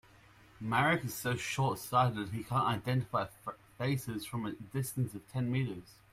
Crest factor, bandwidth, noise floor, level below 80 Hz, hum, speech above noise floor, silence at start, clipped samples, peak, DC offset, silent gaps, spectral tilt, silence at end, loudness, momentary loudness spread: 20 dB; 16 kHz; -60 dBFS; -64 dBFS; none; 26 dB; 0.6 s; under 0.1%; -16 dBFS; under 0.1%; none; -5.5 dB/octave; 0.2 s; -34 LUFS; 10 LU